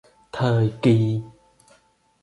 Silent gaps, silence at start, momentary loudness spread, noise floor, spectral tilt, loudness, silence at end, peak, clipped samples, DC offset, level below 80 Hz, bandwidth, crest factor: none; 0.35 s; 11 LU; -60 dBFS; -8.5 dB/octave; -21 LUFS; 0.95 s; -6 dBFS; under 0.1%; under 0.1%; -56 dBFS; 11 kHz; 18 dB